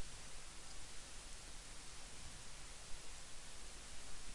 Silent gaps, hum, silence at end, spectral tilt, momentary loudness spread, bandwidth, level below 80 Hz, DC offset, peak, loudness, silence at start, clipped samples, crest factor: none; none; 0 s; -1.5 dB/octave; 0 LU; 11.5 kHz; -58 dBFS; under 0.1%; -34 dBFS; -54 LUFS; 0 s; under 0.1%; 14 dB